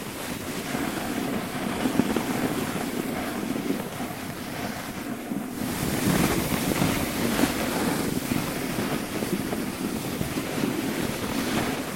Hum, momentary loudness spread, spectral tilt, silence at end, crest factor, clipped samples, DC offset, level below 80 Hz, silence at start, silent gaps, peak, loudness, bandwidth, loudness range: none; 8 LU; -4.5 dB/octave; 0 s; 22 dB; under 0.1%; 0.1%; -48 dBFS; 0 s; none; -6 dBFS; -28 LUFS; 17 kHz; 5 LU